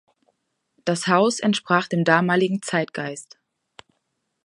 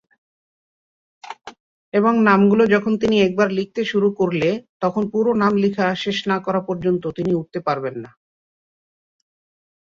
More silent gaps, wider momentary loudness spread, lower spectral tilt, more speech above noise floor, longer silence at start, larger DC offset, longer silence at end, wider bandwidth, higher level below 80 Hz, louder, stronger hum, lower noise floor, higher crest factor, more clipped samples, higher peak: second, none vs 1.60-1.92 s, 4.69-4.80 s; about the same, 12 LU vs 10 LU; second, -5 dB/octave vs -7 dB/octave; second, 54 dB vs over 72 dB; second, 0.85 s vs 1.25 s; neither; second, 1.2 s vs 1.9 s; first, 11.5 kHz vs 7.4 kHz; second, -72 dBFS vs -58 dBFS; about the same, -21 LUFS vs -19 LUFS; neither; second, -75 dBFS vs under -90 dBFS; about the same, 22 dB vs 18 dB; neither; about the same, -2 dBFS vs -2 dBFS